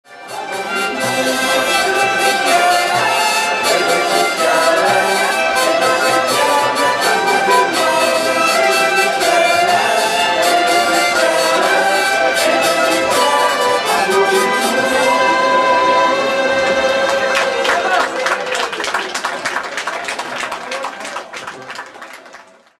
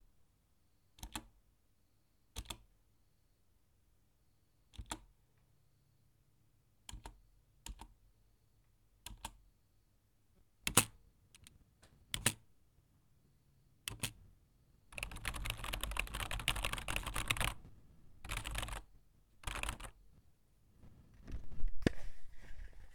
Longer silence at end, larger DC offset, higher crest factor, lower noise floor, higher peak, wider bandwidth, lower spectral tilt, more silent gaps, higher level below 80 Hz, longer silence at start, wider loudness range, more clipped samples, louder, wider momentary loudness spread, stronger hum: first, 0.45 s vs 0 s; neither; second, 14 dB vs 34 dB; second, -41 dBFS vs -76 dBFS; first, -2 dBFS vs -8 dBFS; second, 15 kHz vs 19 kHz; about the same, -1.5 dB/octave vs -2.5 dB/octave; neither; about the same, -56 dBFS vs -52 dBFS; second, 0.1 s vs 1 s; second, 6 LU vs 18 LU; neither; first, -14 LUFS vs -41 LUFS; second, 10 LU vs 21 LU; neither